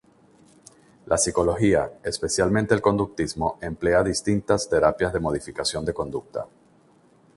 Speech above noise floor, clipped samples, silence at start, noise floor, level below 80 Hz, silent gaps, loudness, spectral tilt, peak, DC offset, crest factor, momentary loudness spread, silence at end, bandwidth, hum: 34 dB; under 0.1%; 1.05 s; -57 dBFS; -44 dBFS; none; -23 LUFS; -4.5 dB/octave; -4 dBFS; under 0.1%; 20 dB; 9 LU; 0.9 s; 11.5 kHz; none